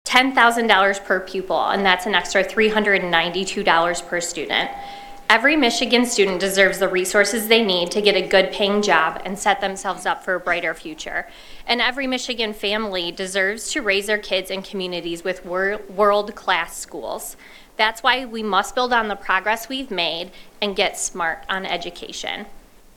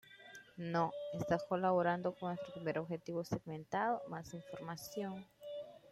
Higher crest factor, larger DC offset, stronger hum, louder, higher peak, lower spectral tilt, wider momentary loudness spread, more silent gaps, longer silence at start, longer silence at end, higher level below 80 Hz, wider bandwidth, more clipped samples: about the same, 20 dB vs 18 dB; neither; neither; first, -20 LUFS vs -40 LUFS; first, 0 dBFS vs -22 dBFS; second, -2.5 dB/octave vs -6.5 dB/octave; second, 12 LU vs 15 LU; neither; about the same, 0.05 s vs 0.05 s; first, 0.35 s vs 0 s; first, -48 dBFS vs -72 dBFS; first, 18 kHz vs 15.5 kHz; neither